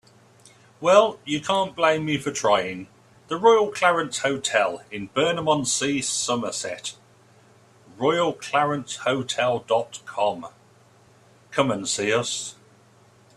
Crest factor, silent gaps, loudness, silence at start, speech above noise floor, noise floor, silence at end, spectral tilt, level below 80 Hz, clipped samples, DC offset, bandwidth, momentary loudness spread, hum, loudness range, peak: 22 dB; none; -23 LUFS; 0.8 s; 32 dB; -55 dBFS; 0.85 s; -3 dB/octave; -66 dBFS; under 0.1%; under 0.1%; 13.5 kHz; 13 LU; none; 5 LU; -2 dBFS